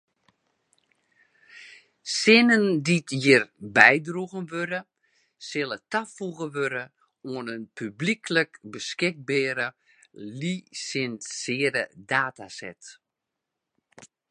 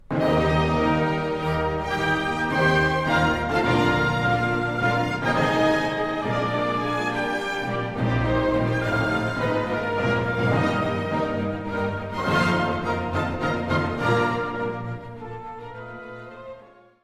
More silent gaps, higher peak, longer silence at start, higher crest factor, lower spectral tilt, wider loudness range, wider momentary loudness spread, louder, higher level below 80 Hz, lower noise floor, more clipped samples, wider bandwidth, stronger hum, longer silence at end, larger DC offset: neither; first, 0 dBFS vs -8 dBFS; first, 1.55 s vs 0.1 s; first, 26 dB vs 16 dB; second, -4 dB/octave vs -6.5 dB/octave; first, 11 LU vs 4 LU; first, 21 LU vs 13 LU; about the same, -24 LUFS vs -23 LUFS; second, -74 dBFS vs -42 dBFS; first, -85 dBFS vs -48 dBFS; neither; second, 11 kHz vs 14.5 kHz; neither; about the same, 0.25 s vs 0.35 s; neither